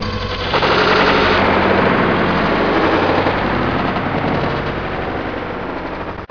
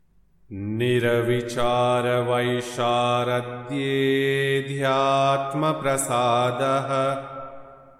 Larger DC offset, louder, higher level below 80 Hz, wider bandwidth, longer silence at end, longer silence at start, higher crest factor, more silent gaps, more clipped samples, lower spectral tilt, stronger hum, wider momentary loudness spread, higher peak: first, 0.8% vs under 0.1%; first, -16 LUFS vs -23 LUFS; first, -34 dBFS vs -56 dBFS; second, 5.4 kHz vs 15 kHz; second, 0.05 s vs 0.25 s; second, 0 s vs 0.5 s; about the same, 16 dB vs 14 dB; neither; neither; first, -6.5 dB/octave vs -5 dB/octave; neither; about the same, 11 LU vs 9 LU; first, 0 dBFS vs -8 dBFS